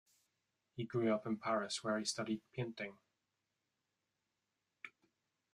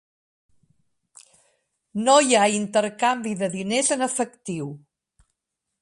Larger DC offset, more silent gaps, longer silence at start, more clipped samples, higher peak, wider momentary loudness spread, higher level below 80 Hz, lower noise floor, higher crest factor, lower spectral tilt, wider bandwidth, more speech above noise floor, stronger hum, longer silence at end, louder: neither; neither; second, 0.75 s vs 1.95 s; neither; second, -24 dBFS vs -4 dBFS; first, 19 LU vs 15 LU; second, -84 dBFS vs -70 dBFS; first, -88 dBFS vs -82 dBFS; about the same, 20 dB vs 20 dB; first, -4.5 dB/octave vs -3 dB/octave; about the same, 12.5 kHz vs 11.5 kHz; second, 49 dB vs 60 dB; neither; second, 0.65 s vs 1.05 s; second, -40 LUFS vs -22 LUFS